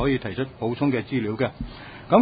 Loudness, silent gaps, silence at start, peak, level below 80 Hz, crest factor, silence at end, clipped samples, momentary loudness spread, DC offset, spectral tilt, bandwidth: -25 LUFS; none; 0 s; -2 dBFS; -44 dBFS; 22 dB; 0 s; under 0.1%; 14 LU; under 0.1%; -11.5 dB/octave; 5 kHz